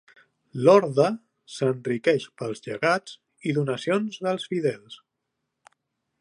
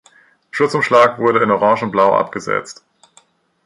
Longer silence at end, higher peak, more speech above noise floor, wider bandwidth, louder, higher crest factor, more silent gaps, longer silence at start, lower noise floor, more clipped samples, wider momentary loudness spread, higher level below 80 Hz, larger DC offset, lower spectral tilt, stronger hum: first, 1.25 s vs 0.95 s; second, -4 dBFS vs 0 dBFS; first, 57 dB vs 39 dB; about the same, 11 kHz vs 11 kHz; second, -24 LUFS vs -15 LUFS; first, 22 dB vs 16 dB; neither; about the same, 0.55 s vs 0.55 s; first, -81 dBFS vs -54 dBFS; neither; first, 17 LU vs 10 LU; second, -74 dBFS vs -60 dBFS; neither; about the same, -6 dB/octave vs -5.5 dB/octave; neither